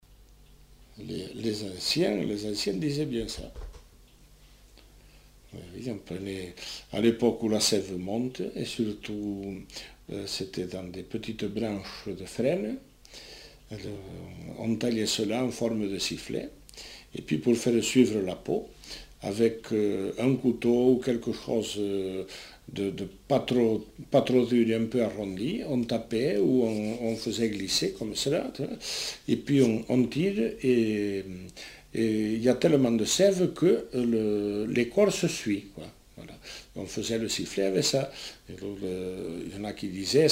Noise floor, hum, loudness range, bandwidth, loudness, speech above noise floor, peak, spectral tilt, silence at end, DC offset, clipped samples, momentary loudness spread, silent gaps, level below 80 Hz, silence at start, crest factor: -55 dBFS; none; 8 LU; 16 kHz; -28 LUFS; 27 dB; -8 dBFS; -5 dB/octave; 0 s; under 0.1%; under 0.1%; 18 LU; none; -56 dBFS; 0.1 s; 20 dB